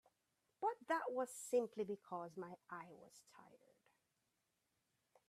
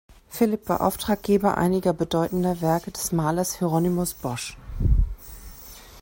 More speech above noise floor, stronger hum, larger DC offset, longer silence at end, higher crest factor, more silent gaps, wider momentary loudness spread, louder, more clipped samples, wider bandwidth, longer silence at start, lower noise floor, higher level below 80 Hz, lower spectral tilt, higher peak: first, 41 dB vs 21 dB; neither; neither; first, 1.75 s vs 0 s; about the same, 20 dB vs 16 dB; neither; first, 22 LU vs 18 LU; second, -45 LUFS vs -24 LUFS; neither; about the same, 15.5 kHz vs 16.5 kHz; first, 0.6 s vs 0.1 s; first, -87 dBFS vs -44 dBFS; second, under -90 dBFS vs -32 dBFS; second, -4.5 dB/octave vs -6 dB/octave; second, -28 dBFS vs -8 dBFS